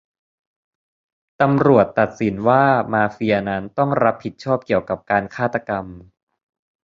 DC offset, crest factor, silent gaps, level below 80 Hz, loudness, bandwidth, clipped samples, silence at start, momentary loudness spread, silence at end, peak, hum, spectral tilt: under 0.1%; 18 dB; none; -52 dBFS; -19 LUFS; 7.4 kHz; under 0.1%; 1.4 s; 10 LU; 0.85 s; -2 dBFS; none; -8 dB/octave